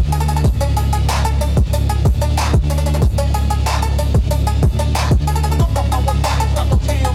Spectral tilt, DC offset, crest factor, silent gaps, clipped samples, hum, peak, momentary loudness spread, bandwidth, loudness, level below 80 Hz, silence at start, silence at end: -6 dB/octave; under 0.1%; 10 dB; none; under 0.1%; none; -4 dBFS; 1 LU; 15 kHz; -16 LUFS; -18 dBFS; 0 s; 0 s